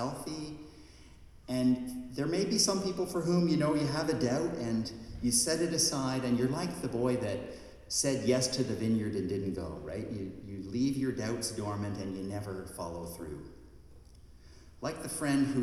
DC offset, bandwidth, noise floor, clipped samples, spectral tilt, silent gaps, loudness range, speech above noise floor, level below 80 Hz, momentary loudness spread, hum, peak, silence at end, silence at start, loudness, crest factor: under 0.1%; 15 kHz; -54 dBFS; under 0.1%; -4.5 dB/octave; none; 8 LU; 22 dB; -56 dBFS; 13 LU; none; -14 dBFS; 0 s; 0 s; -32 LUFS; 18 dB